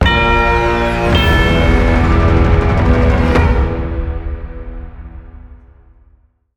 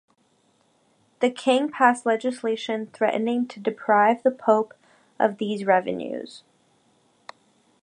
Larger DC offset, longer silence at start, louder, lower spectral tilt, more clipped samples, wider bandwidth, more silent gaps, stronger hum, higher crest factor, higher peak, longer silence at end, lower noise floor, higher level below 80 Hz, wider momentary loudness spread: neither; second, 0 s vs 1.2 s; first, -13 LUFS vs -23 LUFS; first, -7 dB/octave vs -5 dB/octave; neither; first, 17 kHz vs 10.5 kHz; neither; neither; second, 12 dB vs 22 dB; first, 0 dBFS vs -4 dBFS; second, 1 s vs 1.45 s; second, -51 dBFS vs -65 dBFS; first, -18 dBFS vs -76 dBFS; first, 19 LU vs 11 LU